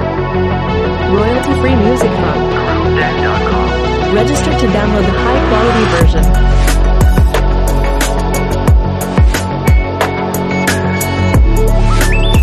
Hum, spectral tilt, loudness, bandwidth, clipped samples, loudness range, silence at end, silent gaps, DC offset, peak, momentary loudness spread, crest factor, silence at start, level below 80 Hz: none; -6 dB/octave; -12 LUFS; 13.5 kHz; under 0.1%; 2 LU; 0 s; none; under 0.1%; 0 dBFS; 4 LU; 10 dB; 0 s; -14 dBFS